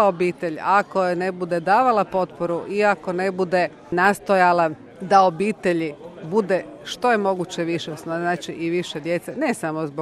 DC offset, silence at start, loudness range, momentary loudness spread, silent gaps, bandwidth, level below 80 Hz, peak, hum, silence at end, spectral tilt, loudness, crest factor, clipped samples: under 0.1%; 0 s; 4 LU; 9 LU; none; 13.5 kHz; -62 dBFS; -2 dBFS; none; 0 s; -5.5 dB/octave; -21 LUFS; 18 dB; under 0.1%